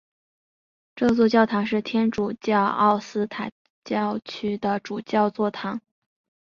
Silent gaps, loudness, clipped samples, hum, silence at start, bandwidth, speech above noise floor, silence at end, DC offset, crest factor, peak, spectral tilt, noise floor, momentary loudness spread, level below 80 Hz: 3.52-3.82 s; -24 LUFS; under 0.1%; none; 0.95 s; 7.2 kHz; over 67 dB; 0.7 s; under 0.1%; 20 dB; -4 dBFS; -6.5 dB/octave; under -90 dBFS; 11 LU; -60 dBFS